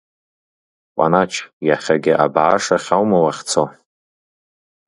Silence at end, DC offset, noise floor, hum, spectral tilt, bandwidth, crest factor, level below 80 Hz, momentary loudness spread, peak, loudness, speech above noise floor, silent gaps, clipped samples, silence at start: 1.15 s; under 0.1%; under -90 dBFS; none; -4.5 dB/octave; 11.5 kHz; 18 dB; -58 dBFS; 7 LU; 0 dBFS; -17 LUFS; over 74 dB; 1.53-1.61 s; under 0.1%; 0.95 s